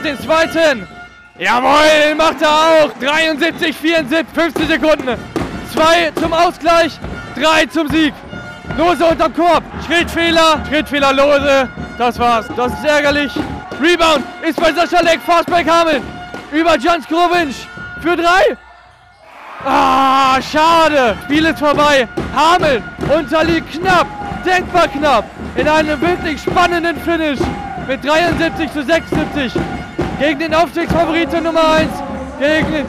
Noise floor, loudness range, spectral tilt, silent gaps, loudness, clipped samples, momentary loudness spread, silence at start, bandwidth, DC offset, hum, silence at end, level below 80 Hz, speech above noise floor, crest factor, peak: -43 dBFS; 3 LU; -4.5 dB/octave; none; -13 LUFS; under 0.1%; 10 LU; 0 s; 15.5 kHz; under 0.1%; none; 0 s; -36 dBFS; 30 dB; 8 dB; -6 dBFS